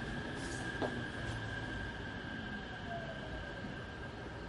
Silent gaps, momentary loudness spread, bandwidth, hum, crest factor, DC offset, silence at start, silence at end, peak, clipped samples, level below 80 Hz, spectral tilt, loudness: none; 6 LU; 11.5 kHz; none; 18 dB; under 0.1%; 0 s; 0 s; -24 dBFS; under 0.1%; -52 dBFS; -5 dB/octave; -42 LUFS